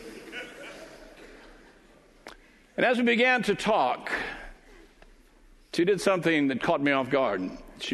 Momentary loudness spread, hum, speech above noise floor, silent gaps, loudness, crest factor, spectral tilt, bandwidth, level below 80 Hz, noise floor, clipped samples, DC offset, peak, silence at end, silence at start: 20 LU; none; 32 dB; none; -26 LUFS; 20 dB; -5 dB/octave; 12 kHz; -56 dBFS; -56 dBFS; under 0.1%; under 0.1%; -8 dBFS; 0 s; 0 s